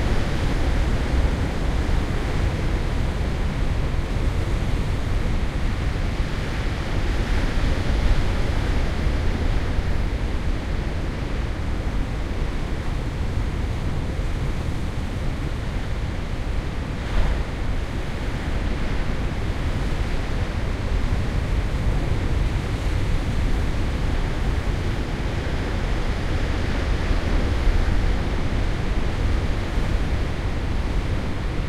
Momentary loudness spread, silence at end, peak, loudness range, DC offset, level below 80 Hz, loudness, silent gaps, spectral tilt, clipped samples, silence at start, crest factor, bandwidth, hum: 4 LU; 0 s; -6 dBFS; 3 LU; under 0.1%; -24 dBFS; -26 LUFS; none; -6.5 dB/octave; under 0.1%; 0 s; 16 dB; 12 kHz; none